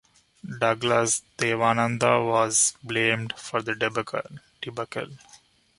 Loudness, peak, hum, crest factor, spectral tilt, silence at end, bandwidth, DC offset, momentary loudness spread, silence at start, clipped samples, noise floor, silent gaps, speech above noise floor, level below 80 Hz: -24 LUFS; -4 dBFS; none; 22 dB; -3 dB/octave; 0.6 s; 11.5 kHz; under 0.1%; 15 LU; 0.45 s; under 0.1%; -56 dBFS; none; 31 dB; -64 dBFS